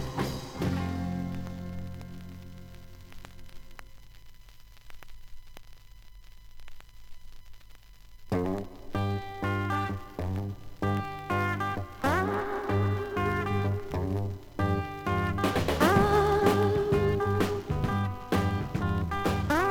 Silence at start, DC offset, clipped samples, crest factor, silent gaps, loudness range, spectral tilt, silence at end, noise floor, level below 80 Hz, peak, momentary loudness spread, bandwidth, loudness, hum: 0 s; under 0.1%; under 0.1%; 22 dB; none; 15 LU; -6.5 dB/octave; 0 s; -49 dBFS; -46 dBFS; -8 dBFS; 19 LU; 18 kHz; -29 LUFS; none